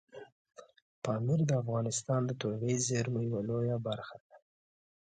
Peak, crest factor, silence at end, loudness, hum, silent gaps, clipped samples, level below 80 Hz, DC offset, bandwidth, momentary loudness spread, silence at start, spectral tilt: -18 dBFS; 16 dB; 0.65 s; -33 LUFS; none; 0.32-0.45 s, 0.82-1.02 s, 4.20-4.30 s; under 0.1%; -68 dBFS; under 0.1%; 9.4 kHz; 11 LU; 0.15 s; -5.5 dB/octave